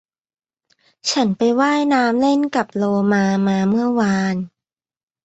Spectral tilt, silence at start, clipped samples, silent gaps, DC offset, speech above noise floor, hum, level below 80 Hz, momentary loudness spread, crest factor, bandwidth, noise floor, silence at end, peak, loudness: -5.5 dB/octave; 1.05 s; under 0.1%; none; under 0.1%; over 73 dB; none; -60 dBFS; 6 LU; 16 dB; 8.2 kHz; under -90 dBFS; 0.8 s; -4 dBFS; -18 LUFS